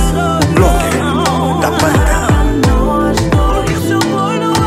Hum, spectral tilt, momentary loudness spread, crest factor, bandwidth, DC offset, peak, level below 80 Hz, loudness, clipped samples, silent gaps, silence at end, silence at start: none; -5.5 dB/octave; 3 LU; 12 dB; 16.5 kHz; under 0.1%; 0 dBFS; -18 dBFS; -12 LUFS; under 0.1%; none; 0 s; 0 s